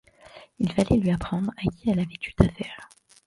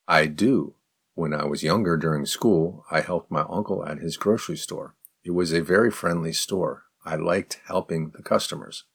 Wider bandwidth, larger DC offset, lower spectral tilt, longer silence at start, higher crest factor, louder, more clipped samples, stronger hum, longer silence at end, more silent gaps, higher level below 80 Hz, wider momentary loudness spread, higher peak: second, 11.5 kHz vs 19 kHz; neither; first, -7.5 dB/octave vs -5 dB/octave; first, 0.35 s vs 0.1 s; about the same, 24 dB vs 24 dB; about the same, -25 LUFS vs -25 LUFS; neither; neither; first, 0.4 s vs 0.15 s; neither; first, -40 dBFS vs -58 dBFS; about the same, 12 LU vs 11 LU; about the same, -2 dBFS vs -2 dBFS